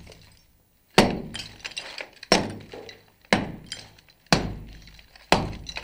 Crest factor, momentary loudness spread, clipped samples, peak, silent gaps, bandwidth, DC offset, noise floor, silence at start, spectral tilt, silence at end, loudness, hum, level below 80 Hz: 26 dB; 20 LU; under 0.1%; -2 dBFS; none; 16.5 kHz; under 0.1%; -61 dBFS; 0 s; -4 dB/octave; 0 s; -25 LUFS; none; -44 dBFS